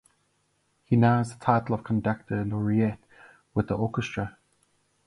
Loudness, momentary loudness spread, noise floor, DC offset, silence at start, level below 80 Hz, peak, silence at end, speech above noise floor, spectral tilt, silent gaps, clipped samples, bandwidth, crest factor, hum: -27 LUFS; 10 LU; -71 dBFS; under 0.1%; 0.9 s; -54 dBFS; -6 dBFS; 0.75 s; 46 dB; -8 dB/octave; none; under 0.1%; 11 kHz; 20 dB; none